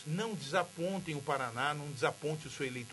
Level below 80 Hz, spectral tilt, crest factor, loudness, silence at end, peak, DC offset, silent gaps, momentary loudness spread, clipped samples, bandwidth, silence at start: -72 dBFS; -4.5 dB/octave; 20 dB; -36 LUFS; 0 s; -16 dBFS; under 0.1%; none; 5 LU; under 0.1%; 11.5 kHz; 0 s